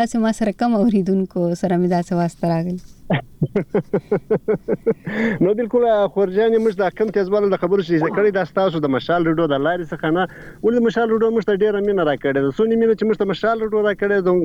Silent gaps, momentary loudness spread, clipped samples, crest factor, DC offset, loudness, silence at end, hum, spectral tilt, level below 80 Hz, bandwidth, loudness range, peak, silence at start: none; 5 LU; under 0.1%; 10 dB; under 0.1%; -19 LUFS; 0 s; none; -7.5 dB/octave; -48 dBFS; 11.5 kHz; 3 LU; -8 dBFS; 0 s